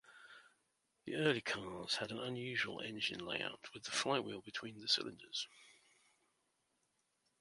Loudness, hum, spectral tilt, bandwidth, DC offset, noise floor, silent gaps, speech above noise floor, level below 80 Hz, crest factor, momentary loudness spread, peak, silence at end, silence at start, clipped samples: -40 LUFS; none; -3 dB/octave; 11.5 kHz; under 0.1%; -82 dBFS; none; 41 dB; -78 dBFS; 24 dB; 13 LU; -18 dBFS; 1.7 s; 0.05 s; under 0.1%